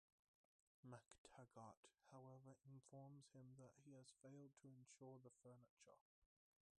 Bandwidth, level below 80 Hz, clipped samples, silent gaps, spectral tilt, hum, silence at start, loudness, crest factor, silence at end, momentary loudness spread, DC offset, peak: 10 kHz; under -90 dBFS; under 0.1%; 1.18-1.25 s, 1.77-1.83 s, 5.69-5.77 s, 6.01-6.22 s; -5.5 dB/octave; none; 0.85 s; -66 LUFS; 24 dB; 0.55 s; 4 LU; under 0.1%; -44 dBFS